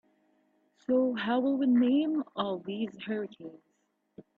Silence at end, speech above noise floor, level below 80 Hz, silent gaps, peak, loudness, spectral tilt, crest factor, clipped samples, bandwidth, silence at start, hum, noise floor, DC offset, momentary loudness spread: 0.15 s; 47 dB; -76 dBFS; none; -16 dBFS; -29 LUFS; -8 dB/octave; 14 dB; under 0.1%; 4.3 kHz; 0.9 s; none; -76 dBFS; under 0.1%; 17 LU